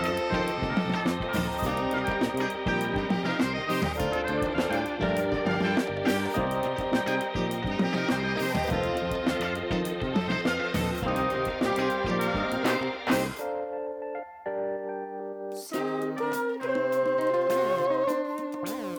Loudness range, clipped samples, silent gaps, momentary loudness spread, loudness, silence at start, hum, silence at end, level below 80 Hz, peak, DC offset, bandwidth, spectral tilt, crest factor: 3 LU; under 0.1%; none; 7 LU; -28 LUFS; 0 s; none; 0 s; -46 dBFS; -14 dBFS; under 0.1%; over 20 kHz; -5.5 dB/octave; 14 dB